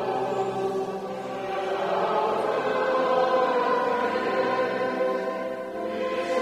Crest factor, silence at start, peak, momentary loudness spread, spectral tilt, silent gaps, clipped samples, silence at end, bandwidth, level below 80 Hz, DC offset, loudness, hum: 14 dB; 0 s; -10 dBFS; 9 LU; -5 dB/octave; none; under 0.1%; 0 s; 13 kHz; -66 dBFS; under 0.1%; -26 LUFS; none